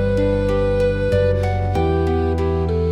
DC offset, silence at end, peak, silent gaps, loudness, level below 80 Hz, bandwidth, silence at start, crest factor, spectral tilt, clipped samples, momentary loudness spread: under 0.1%; 0 s; -6 dBFS; none; -19 LUFS; -28 dBFS; 10 kHz; 0 s; 12 dB; -8.5 dB/octave; under 0.1%; 2 LU